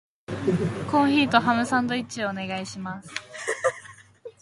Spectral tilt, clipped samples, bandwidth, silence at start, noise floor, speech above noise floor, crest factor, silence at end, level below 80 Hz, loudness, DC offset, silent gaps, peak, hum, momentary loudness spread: -5 dB/octave; under 0.1%; 11.5 kHz; 0.3 s; -46 dBFS; 21 dB; 22 dB; 0.1 s; -58 dBFS; -25 LUFS; under 0.1%; none; -4 dBFS; none; 15 LU